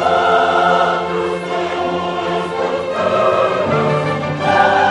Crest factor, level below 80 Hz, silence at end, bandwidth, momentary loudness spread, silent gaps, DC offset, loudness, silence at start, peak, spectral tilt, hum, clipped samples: 16 dB; -50 dBFS; 0 s; 11 kHz; 7 LU; none; under 0.1%; -16 LUFS; 0 s; 0 dBFS; -5.5 dB/octave; none; under 0.1%